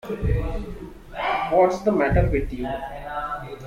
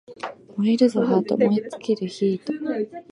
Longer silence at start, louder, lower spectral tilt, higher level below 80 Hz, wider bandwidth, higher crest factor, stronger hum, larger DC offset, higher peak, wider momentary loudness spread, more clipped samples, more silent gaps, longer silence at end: about the same, 0.05 s vs 0.1 s; about the same, -24 LUFS vs -22 LUFS; about the same, -7.5 dB/octave vs -7 dB/octave; first, -32 dBFS vs -70 dBFS; first, 15 kHz vs 11 kHz; about the same, 18 dB vs 16 dB; neither; neither; about the same, -6 dBFS vs -6 dBFS; first, 14 LU vs 11 LU; neither; neither; about the same, 0 s vs 0.1 s